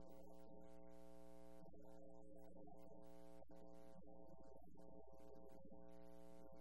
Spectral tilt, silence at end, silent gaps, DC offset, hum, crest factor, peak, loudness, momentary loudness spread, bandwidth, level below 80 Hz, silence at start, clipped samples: -7 dB/octave; 0 s; none; 0.2%; none; 14 dB; -48 dBFS; -65 LUFS; 1 LU; 16 kHz; -74 dBFS; 0 s; under 0.1%